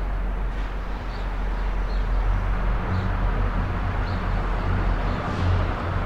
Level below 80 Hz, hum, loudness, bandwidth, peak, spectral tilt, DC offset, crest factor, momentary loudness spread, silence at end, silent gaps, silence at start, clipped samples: -26 dBFS; none; -27 LUFS; 6.2 kHz; -12 dBFS; -7.5 dB/octave; under 0.1%; 12 dB; 6 LU; 0 s; none; 0 s; under 0.1%